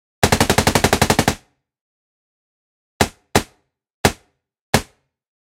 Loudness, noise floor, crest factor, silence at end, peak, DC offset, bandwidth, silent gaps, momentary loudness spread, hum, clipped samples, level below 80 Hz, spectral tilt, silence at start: -18 LUFS; -57 dBFS; 22 dB; 0.75 s; 0 dBFS; under 0.1%; 17.5 kHz; 1.81-3.00 s, 3.94-4.04 s, 4.61-4.73 s; 7 LU; none; under 0.1%; -36 dBFS; -4 dB/octave; 0.2 s